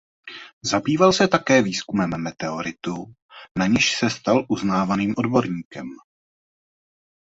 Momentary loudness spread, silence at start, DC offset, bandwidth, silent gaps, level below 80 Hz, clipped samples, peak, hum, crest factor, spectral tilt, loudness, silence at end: 18 LU; 0.25 s; under 0.1%; 8 kHz; 0.53-0.61 s, 3.22-3.29 s, 3.51-3.55 s, 5.65-5.71 s; -54 dBFS; under 0.1%; 0 dBFS; none; 22 dB; -4.5 dB/octave; -21 LUFS; 1.25 s